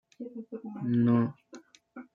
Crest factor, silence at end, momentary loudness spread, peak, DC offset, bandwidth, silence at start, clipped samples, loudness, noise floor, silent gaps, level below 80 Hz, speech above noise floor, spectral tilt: 16 dB; 0.1 s; 25 LU; -14 dBFS; under 0.1%; 7.2 kHz; 0.2 s; under 0.1%; -28 LUFS; -53 dBFS; none; -72 dBFS; 25 dB; -9.5 dB/octave